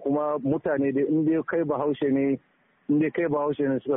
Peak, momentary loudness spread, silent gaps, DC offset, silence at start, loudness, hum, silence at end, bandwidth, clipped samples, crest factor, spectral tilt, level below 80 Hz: -12 dBFS; 3 LU; none; under 0.1%; 0 s; -25 LUFS; none; 0 s; 3.8 kHz; under 0.1%; 12 dB; -4.5 dB/octave; -64 dBFS